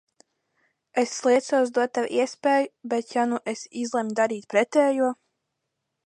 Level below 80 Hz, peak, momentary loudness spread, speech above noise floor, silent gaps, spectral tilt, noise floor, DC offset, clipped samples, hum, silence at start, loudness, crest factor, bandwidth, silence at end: -80 dBFS; -8 dBFS; 8 LU; 57 dB; none; -3.5 dB/octave; -80 dBFS; under 0.1%; under 0.1%; none; 0.95 s; -24 LUFS; 18 dB; 11 kHz; 0.95 s